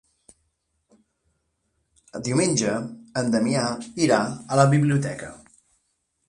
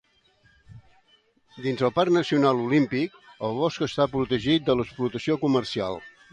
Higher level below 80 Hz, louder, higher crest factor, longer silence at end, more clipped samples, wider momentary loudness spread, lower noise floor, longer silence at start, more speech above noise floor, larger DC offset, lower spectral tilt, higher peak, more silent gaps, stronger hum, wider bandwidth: about the same, -60 dBFS vs -56 dBFS; about the same, -23 LUFS vs -25 LUFS; about the same, 22 dB vs 18 dB; first, 0.9 s vs 0.25 s; neither; first, 13 LU vs 10 LU; first, -73 dBFS vs -63 dBFS; first, 2.15 s vs 0.7 s; first, 51 dB vs 39 dB; neither; about the same, -5.5 dB/octave vs -6.5 dB/octave; first, -4 dBFS vs -8 dBFS; neither; neither; first, 11.5 kHz vs 9.6 kHz